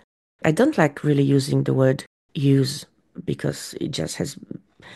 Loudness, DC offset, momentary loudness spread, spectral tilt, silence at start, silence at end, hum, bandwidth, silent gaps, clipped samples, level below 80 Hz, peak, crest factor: -22 LUFS; under 0.1%; 15 LU; -6.5 dB/octave; 0.45 s; 0 s; none; 12.5 kHz; 2.07-2.29 s; under 0.1%; -58 dBFS; -4 dBFS; 18 dB